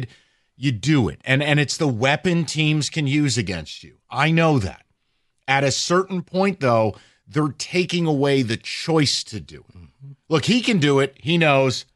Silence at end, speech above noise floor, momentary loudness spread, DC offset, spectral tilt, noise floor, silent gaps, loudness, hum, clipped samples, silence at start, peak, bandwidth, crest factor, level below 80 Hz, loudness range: 0.15 s; 48 dB; 10 LU; under 0.1%; -5 dB/octave; -69 dBFS; none; -20 LUFS; none; under 0.1%; 0 s; -2 dBFS; 12 kHz; 18 dB; -52 dBFS; 2 LU